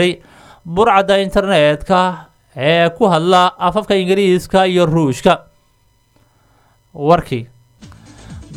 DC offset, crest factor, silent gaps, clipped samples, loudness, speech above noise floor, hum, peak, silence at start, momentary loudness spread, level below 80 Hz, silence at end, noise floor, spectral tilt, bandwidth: under 0.1%; 16 dB; none; under 0.1%; -14 LUFS; 43 dB; none; 0 dBFS; 0 s; 10 LU; -40 dBFS; 0 s; -56 dBFS; -6 dB/octave; 15.5 kHz